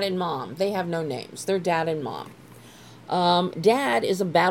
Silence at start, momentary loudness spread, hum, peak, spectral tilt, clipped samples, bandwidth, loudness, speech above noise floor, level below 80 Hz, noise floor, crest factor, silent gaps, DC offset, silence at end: 0 s; 11 LU; none; -8 dBFS; -5 dB/octave; under 0.1%; 17.5 kHz; -24 LUFS; 23 dB; -68 dBFS; -47 dBFS; 18 dB; none; under 0.1%; 0 s